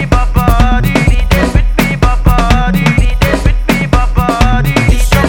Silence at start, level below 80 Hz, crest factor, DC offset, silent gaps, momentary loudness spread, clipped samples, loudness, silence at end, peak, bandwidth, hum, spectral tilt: 0 s; -12 dBFS; 8 dB; under 0.1%; none; 2 LU; 1%; -11 LUFS; 0 s; 0 dBFS; 19.5 kHz; none; -6 dB/octave